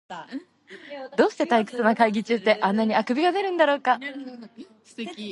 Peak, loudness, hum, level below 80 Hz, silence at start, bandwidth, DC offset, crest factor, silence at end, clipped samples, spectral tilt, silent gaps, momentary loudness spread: -4 dBFS; -22 LUFS; none; -76 dBFS; 0.1 s; 11 kHz; under 0.1%; 20 dB; 0 s; under 0.1%; -5.5 dB/octave; none; 18 LU